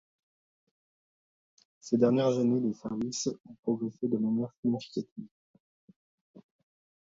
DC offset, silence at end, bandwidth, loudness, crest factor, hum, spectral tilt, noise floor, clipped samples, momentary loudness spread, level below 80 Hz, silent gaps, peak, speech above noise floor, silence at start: under 0.1%; 0.65 s; 7.8 kHz; -30 LUFS; 22 dB; none; -6 dB/octave; under -90 dBFS; under 0.1%; 13 LU; -74 dBFS; 3.59-3.63 s, 4.57-4.63 s, 5.12-5.16 s, 5.31-5.54 s, 5.60-5.88 s, 5.96-6.34 s; -12 dBFS; over 60 dB; 1.85 s